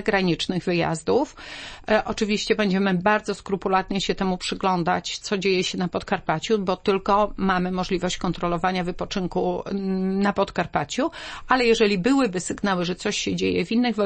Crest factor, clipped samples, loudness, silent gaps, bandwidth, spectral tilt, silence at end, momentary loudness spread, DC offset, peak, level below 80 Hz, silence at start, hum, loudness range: 20 dB; under 0.1%; -23 LUFS; none; 8.8 kHz; -5 dB/octave; 0 s; 6 LU; under 0.1%; -4 dBFS; -44 dBFS; 0 s; none; 2 LU